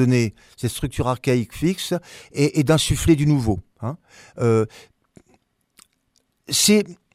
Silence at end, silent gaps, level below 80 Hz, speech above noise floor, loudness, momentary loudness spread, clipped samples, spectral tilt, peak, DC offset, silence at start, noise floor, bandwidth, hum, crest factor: 0.2 s; none; -40 dBFS; 47 dB; -21 LUFS; 13 LU; under 0.1%; -5 dB/octave; -2 dBFS; under 0.1%; 0 s; -67 dBFS; 16 kHz; none; 18 dB